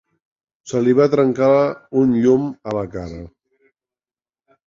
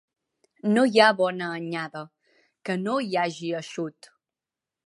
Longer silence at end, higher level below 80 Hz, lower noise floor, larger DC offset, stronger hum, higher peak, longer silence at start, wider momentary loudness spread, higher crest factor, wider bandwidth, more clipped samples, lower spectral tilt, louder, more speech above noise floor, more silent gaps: first, 1.4 s vs 0.95 s; first, -50 dBFS vs -80 dBFS; about the same, under -90 dBFS vs -90 dBFS; neither; neither; about the same, -2 dBFS vs -2 dBFS; about the same, 0.65 s vs 0.65 s; second, 14 LU vs 17 LU; second, 16 dB vs 24 dB; second, 7.6 kHz vs 11.5 kHz; neither; first, -7.5 dB/octave vs -5 dB/octave; first, -17 LUFS vs -24 LUFS; first, over 73 dB vs 65 dB; neither